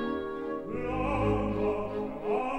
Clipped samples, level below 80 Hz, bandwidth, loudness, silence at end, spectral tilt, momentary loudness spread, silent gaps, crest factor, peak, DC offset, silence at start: under 0.1%; -44 dBFS; 8.8 kHz; -31 LUFS; 0 s; -8 dB/octave; 7 LU; none; 14 dB; -16 dBFS; under 0.1%; 0 s